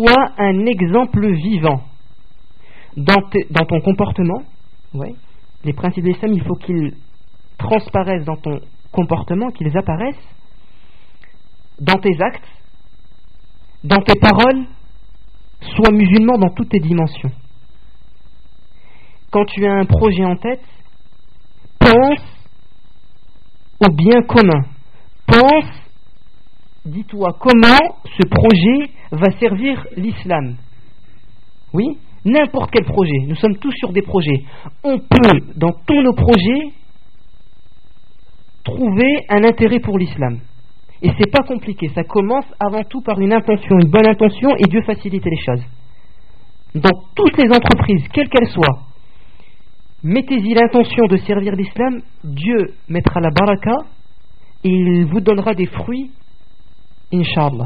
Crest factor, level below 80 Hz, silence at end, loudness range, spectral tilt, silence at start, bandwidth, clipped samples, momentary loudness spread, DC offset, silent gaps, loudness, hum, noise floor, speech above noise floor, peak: 16 dB; -34 dBFS; 0 s; 7 LU; -5.5 dB/octave; 0 s; 5.2 kHz; under 0.1%; 14 LU; 4%; none; -14 LUFS; none; -49 dBFS; 36 dB; 0 dBFS